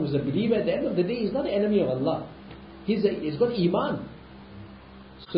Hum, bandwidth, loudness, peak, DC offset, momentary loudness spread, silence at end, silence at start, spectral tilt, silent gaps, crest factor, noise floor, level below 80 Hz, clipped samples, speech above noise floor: none; 5.6 kHz; -26 LUFS; -10 dBFS; under 0.1%; 21 LU; 0 s; 0 s; -11.5 dB/octave; none; 18 dB; -46 dBFS; -54 dBFS; under 0.1%; 21 dB